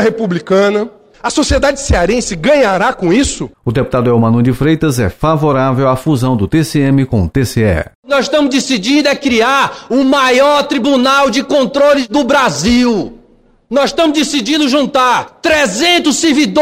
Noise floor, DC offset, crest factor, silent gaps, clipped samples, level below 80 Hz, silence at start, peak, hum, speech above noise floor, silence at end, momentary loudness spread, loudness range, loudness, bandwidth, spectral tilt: -47 dBFS; under 0.1%; 10 dB; 7.95-8.03 s; under 0.1%; -30 dBFS; 0 s; -2 dBFS; none; 36 dB; 0 s; 5 LU; 2 LU; -11 LUFS; 16 kHz; -5 dB/octave